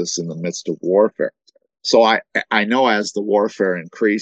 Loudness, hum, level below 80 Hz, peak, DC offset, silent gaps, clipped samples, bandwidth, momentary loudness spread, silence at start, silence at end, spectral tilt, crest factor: -18 LUFS; none; -70 dBFS; 0 dBFS; under 0.1%; none; under 0.1%; 8.8 kHz; 11 LU; 0 s; 0 s; -4 dB/octave; 18 dB